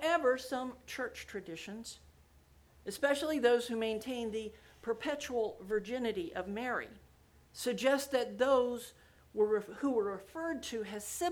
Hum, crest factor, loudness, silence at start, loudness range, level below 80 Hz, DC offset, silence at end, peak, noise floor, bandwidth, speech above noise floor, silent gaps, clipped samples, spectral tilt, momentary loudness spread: none; 20 dB; -35 LUFS; 0 s; 4 LU; -66 dBFS; under 0.1%; 0 s; -16 dBFS; -64 dBFS; over 20 kHz; 29 dB; none; under 0.1%; -3.5 dB/octave; 15 LU